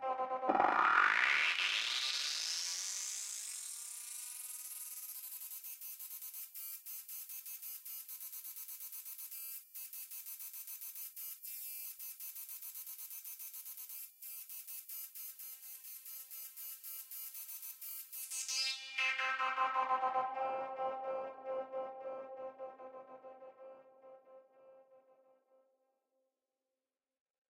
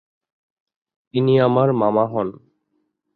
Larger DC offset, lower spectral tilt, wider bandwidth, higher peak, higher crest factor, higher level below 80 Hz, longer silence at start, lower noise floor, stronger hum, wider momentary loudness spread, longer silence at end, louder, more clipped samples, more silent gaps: neither; second, 1 dB/octave vs -11 dB/octave; first, 17 kHz vs 4.7 kHz; second, -14 dBFS vs -4 dBFS; first, 26 dB vs 18 dB; second, under -90 dBFS vs -62 dBFS; second, 0 s vs 1.15 s; first, under -90 dBFS vs -71 dBFS; neither; first, 14 LU vs 11 LU; first, 2.5 s vs 0.85 s; second, -39 LUFS vs -19 LUFS; neither; neither